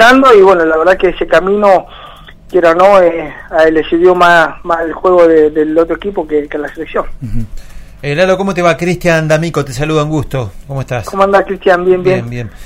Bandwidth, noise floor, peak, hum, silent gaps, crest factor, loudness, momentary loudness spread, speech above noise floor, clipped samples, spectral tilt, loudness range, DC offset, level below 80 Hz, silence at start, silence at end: 16 kHz; -33 dBFS; 0 dBFS; none; none; 10 dB; -10 LUFS; 14 LU; 23 dB; 1%; -6 dB/octave; 5 LU; under 0.1%; -30 dBFS; 0 s; 0 s